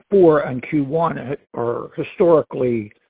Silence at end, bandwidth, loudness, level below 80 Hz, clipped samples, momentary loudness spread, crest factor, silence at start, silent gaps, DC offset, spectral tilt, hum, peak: 0.2 s; 4 kHz; -19 LUFS; -54 dBFS; under 0.1%; 13 LU; 16 dB; 0.1 s; none; under 0.1%; -12 dB/octave; none; -2 dBFS